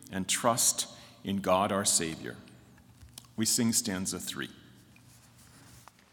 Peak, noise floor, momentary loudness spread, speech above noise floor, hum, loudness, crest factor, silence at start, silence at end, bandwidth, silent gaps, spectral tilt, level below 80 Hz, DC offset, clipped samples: -10 dBFS; -57 dBFS; 18 LU; 27 dB; none; -29 LUFS; 22 dB; 0 s; 0.35 s; 18 kHz; none; -2.5 dB/octave; -68 dBFS; under 0.1%; under 0.1%